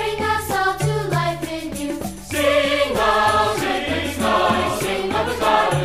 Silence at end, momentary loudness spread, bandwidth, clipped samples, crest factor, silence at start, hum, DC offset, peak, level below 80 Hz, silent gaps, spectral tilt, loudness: 0 s; 10 LU; 15.5 kHz; under 0.1%; 16 dB; 0 s; none; 0.5%; -4 dBFS; -42 dBFS; none; -4.5 dB/octave; -20 LUFS